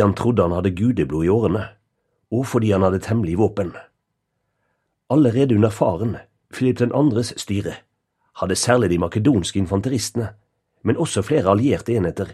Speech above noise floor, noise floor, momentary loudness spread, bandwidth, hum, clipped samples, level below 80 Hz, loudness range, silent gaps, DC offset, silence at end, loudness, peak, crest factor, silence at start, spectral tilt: 56 dB; -74 dBFS; 10 LU; 13 kHz; none; under 0.1%; -46 dBFS; 2 LU; none; under 0.1%; 0 s; -20 LUFS; 0 dBFS; 20 dB; 0 s; -6.5 dB/octave